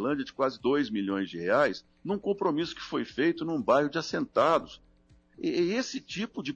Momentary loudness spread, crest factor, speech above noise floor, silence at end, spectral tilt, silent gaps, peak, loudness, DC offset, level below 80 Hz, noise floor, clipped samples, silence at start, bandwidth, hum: 9 LU; 16 dB; 33 dB; 0 s; -5.5 dB/octave; none; -14 dBFS; -29 LUFS; under 0.1%; -64 dBFS; -61 dBFS; under 0.1%; 0 s; 8.2 kHz; none